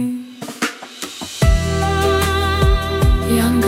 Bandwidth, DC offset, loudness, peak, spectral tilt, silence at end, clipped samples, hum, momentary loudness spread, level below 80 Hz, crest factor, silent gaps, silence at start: 16.5 kHz; under 0.1%; -17 LUFS; -2 dBFS; -5.5 dB/octave; 0 s; under 0.1%; none; 12 LU; -22 dBFS; 16 dB; none; 0 s